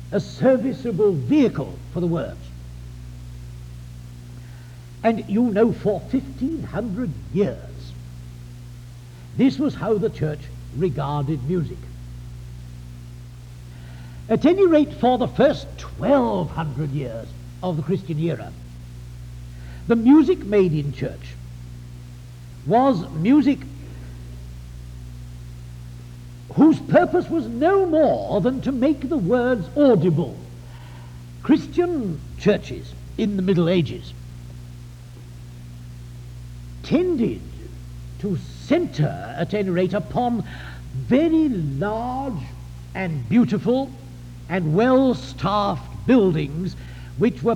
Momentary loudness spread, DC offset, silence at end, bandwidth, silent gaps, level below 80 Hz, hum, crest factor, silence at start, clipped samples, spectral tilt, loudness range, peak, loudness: 22 LU; under 0.1%; 0 s; 14 kHz; none; -42 dBFS; 60 Hz at -45 dBFS; 18 dB; 0 s; under 0.1%; -8 dB/octave; 8 LU; -4 dBFS; -21 LUFS